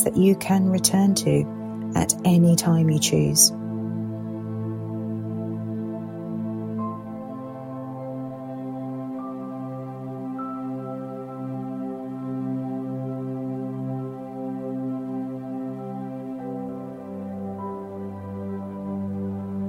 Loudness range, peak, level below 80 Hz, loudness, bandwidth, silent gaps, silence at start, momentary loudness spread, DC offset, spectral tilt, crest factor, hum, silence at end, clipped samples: 13 LU; -2 dBFS; -58 dBFS; -26 LUFS; 16 kHz; none; 0 s; 15 LU; under 0.1%; -5 dB/octave; 24 dB; none; 0 s; under 0.1%